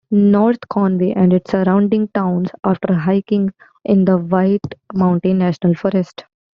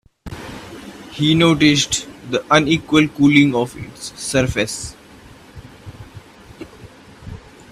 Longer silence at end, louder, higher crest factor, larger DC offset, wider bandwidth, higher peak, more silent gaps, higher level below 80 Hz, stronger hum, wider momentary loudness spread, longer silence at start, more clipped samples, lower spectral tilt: about the same, 0.35 s vs 0.3 s; about the same, -16 LUFS vs -16 LUFS; second, 12 dB vs 20 dB; neither; second, 5.6 kHz vs 13.5 kHz; second, -4 dBFS vs 0 dBFS; neither; second, -54 dBFS vs -44 dBFS; neither; second, 5 LU vs 25 LU; second, 0.1 s vs 0.25 s; neither; first, -8.5 dB/octave vs -4.5 dB/octave